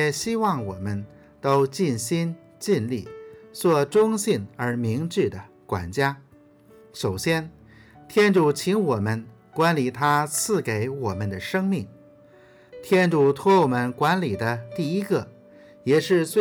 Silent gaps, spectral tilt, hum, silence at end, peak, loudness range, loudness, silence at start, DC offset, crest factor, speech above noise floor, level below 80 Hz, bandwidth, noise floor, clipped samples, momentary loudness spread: none; -5.5 dB/octave; none; 0 s; -8 dBFS; 4 LU; -23 LUFS; 0 s; under 0.1%; 16 dB; 30 dB; -64 dBFS; over 20 kHz; -53 dBFS; under 0.1%; 13 LU